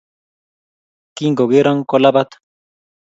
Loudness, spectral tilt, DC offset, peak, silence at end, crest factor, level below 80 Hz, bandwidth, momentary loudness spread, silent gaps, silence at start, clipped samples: -14 LUFS; -6.5 dB/octave; under 0.1%; 0 dBFS; 0.8 s; 18 dB; -66 dBFS; 7.8 kHz; 8 LU; none; 1.15 s; under 0.1%